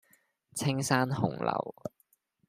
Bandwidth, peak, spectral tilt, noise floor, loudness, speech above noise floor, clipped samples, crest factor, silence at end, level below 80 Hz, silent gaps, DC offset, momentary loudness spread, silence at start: 15.5 kHz; -10 dBFS; -5 dB/octave; -72 dBFS; -31 LUFS; 41 dB; under 0.1%; 22 dB; 0.6 s; -68 dBFS; none; under 0.1%; 15 LU; 0.55 s